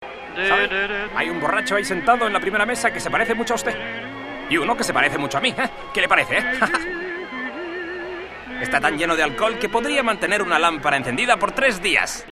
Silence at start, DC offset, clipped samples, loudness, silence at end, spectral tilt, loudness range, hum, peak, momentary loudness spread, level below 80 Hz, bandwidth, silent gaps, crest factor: 0 s; under 0.1%; under 0.1%; -20 LUFS; 0 s; -3 dB/octave; 3 LU; none; 0 dBFS; 11 LU; -46 dBFS; 14 kHz; none; 22 dB